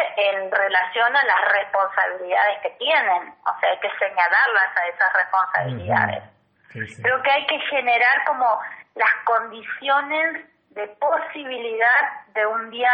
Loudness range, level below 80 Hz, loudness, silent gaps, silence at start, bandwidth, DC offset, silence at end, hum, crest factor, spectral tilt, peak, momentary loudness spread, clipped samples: 3 LU; -70 dBFS; -20 LUFS; none; 0 s; 8.6 kHz; under 0.1%; 0 s; none; 16 dB; -5.5 dB/octave; -6 dBFS; 11 LU; under 0.1%